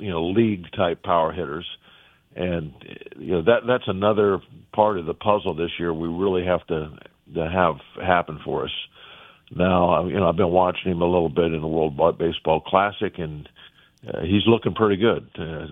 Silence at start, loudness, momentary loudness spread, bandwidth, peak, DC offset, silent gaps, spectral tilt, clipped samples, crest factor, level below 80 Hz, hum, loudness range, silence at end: 0 s; -22 LUFS; 14 LU; 4 kHz; -2 dBFS; under 0.1%; none; -9.5 dB/octave; under 0.1%; 22 dB; -48 dBFS; none; 4 LU; 0 s